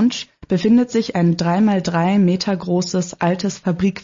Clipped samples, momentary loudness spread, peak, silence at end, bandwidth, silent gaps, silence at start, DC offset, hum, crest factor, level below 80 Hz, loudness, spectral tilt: under 0.1%; 6 LU; -6 dBFS; 0.05 s; 7.6 kHz; none; 0 s; under 0.1%; none; 10 dB; -52 dBFS; -18 LUFS; -6 dB/octave